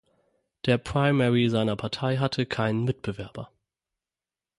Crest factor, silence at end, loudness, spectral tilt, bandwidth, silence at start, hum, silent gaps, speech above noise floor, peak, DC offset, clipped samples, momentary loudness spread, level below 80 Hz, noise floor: 18 dB; 1.15 s; -26 LUFS; -7 dB/octave; 11.5 kHz; 0.65 s; none; none; over 65 dB; -8 dBFS; under 0.1%; under 0.1%; 15 LU; -54 dBFS; under -90 dBFS